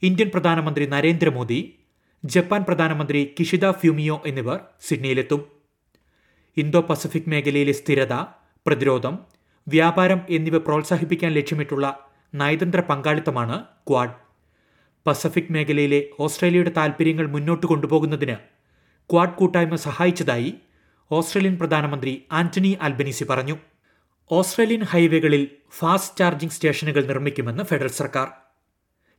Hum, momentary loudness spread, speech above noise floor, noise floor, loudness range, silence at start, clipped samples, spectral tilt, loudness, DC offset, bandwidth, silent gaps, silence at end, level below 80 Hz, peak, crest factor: none; 8 LU; 51 dB; -71 dBFS; 3 LU; 0 s; under 0.1%; -6 dB/octave; -21 LUFS; under 0.1%; 18 kHz; none; 0.85 s; -68 dBFS; -2 dBFS; 20 dB